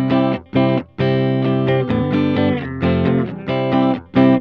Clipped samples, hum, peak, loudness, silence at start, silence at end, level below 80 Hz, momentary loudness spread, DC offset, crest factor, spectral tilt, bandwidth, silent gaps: under 0.1%; none; -2 dBFS; -17 LUFS; 0 s; 0 s; -50 dBFS; 3 LU; under 0.1%; 14 dB; -9.5 dB/octave; 5.4 kHz; none